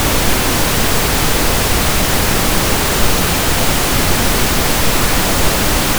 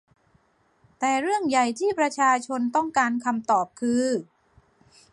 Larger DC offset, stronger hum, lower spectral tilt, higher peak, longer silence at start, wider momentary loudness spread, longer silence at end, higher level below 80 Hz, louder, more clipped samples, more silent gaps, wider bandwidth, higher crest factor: neither; neither; about the same, -3 dB/octave vs -3.5 dB/octave; first, 0 dBFS vs -8 dBFS; second, 0 s vs 1 s; second, 0 LU vs 4 LU; second, 0 s vs 0.9 s; first, -20 dBFS vs -70 dBFS; first, -13 LUFS vs -24 LUFS; neither; neither; first, over 20 kHz vs 11.5 kHz; second, 12 dB vs 18 dB